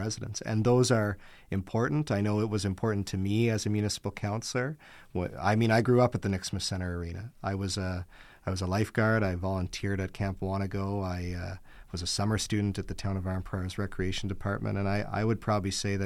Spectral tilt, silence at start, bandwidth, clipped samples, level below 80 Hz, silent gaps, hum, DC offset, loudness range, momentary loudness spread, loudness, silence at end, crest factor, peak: -5.5 dB/octave; 0 s; 14.5 kHz; under 0.1%; -50 dBFS; none; none; under 0.1%; 4 LU; 11 LU; -30 LUFS; 0 s; 18 dB; -12 dBFS